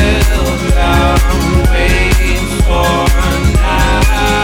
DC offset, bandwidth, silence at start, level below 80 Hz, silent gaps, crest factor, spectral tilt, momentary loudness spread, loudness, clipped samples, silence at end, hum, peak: under 0.1%; 17 kHz; 0 s; -12 dBFS; none; 10 dB; -5 dB/octave; 3 LU; -12 LUFS; under 0.1%; 0 s; none; 0 dBFS